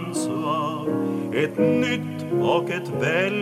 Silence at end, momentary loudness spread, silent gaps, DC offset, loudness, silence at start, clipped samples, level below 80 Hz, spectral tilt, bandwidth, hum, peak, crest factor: 0 s; 6 LU; none; under 0.1%; -23 LUFS; 0 s; under 0.1%; -72 dBFS; -5.5 dB/octave; 14.5 kHz; none; -6 dBFS; 16 dB